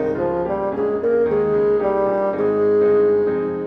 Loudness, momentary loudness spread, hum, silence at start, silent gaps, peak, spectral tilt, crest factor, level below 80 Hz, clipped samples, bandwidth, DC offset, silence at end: -18 LUFS; 6 LU; none; 0 s; none; -8 dBFS; -9.5 dB/octave; 10 dB; -50 dBFS; under 0.1%; 4.4 kHz; under 0.1%; 0 s